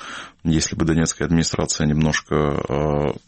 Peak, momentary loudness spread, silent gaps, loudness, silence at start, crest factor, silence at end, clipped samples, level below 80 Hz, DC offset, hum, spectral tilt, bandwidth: -6 dBFS; 3 LU; none; -20 LUFS; 0 s; 14 dB; 0.1 s; under 0.1%; -36 dBFS; under 0.1%; none; -5 dB/octave; 8.8 kHz